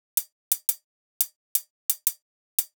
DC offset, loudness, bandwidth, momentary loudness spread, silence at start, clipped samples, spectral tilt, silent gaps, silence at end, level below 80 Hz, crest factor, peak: under 0.1%; -27 LUFS; over 20 kHz; 3 LU; 0.15 s; under 0.1%; 9.5 dB/octave; 0.32-0.51 s, 0.84-1.20 s, 1.36-1.55 s, 1.70-1.89 s, 2.22-2.58 s; 0.1 s; under -90 dBFS; 28 dB; -2 dBFS